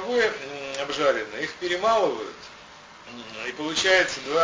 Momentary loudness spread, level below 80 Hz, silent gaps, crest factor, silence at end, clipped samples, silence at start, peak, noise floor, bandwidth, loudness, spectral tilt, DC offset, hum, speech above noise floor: 22 LU; -60 dBFS; none; 18 dB; 0 s; under 0.1%; 0 s; -8 dBFS; -46 dBFS; 8 kHz; -24 LUFS; -2 dB/octave; under 0.1%; none; 22 dB